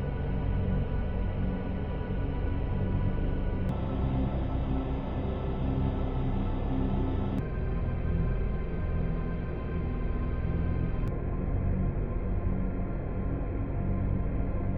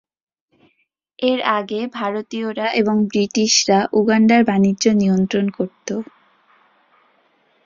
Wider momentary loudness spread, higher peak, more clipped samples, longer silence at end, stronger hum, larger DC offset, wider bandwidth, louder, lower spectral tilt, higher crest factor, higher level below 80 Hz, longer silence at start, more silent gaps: second, 3 LU vs 12 LU; second, -16 dBFS vs -2 dBFS; neither; second, 0 s vs 1.6 s; neither; first, 0.2% vs under 0.1%; second, 4.3 kHz vs 7.6 kHz; second, -32 LUFS vs -18 LUFS; first, -8.5 dB/octave vs -4.5 dB/octave; second, 12 dB vs 18 dB; first, -32 dBFS vs -60 dBFS; second, 0 s vs 1.2 s; neither